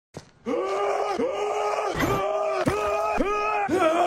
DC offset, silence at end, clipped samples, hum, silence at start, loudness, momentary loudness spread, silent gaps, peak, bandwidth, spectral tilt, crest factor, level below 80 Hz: under 0.1%; 0 s; under 0.1%; none; 0.15 s; -25 LUFS; 3 LU; none; -10 dBFS; 16 kHz; -5 dB/octave; 14 dB; -46 dBFS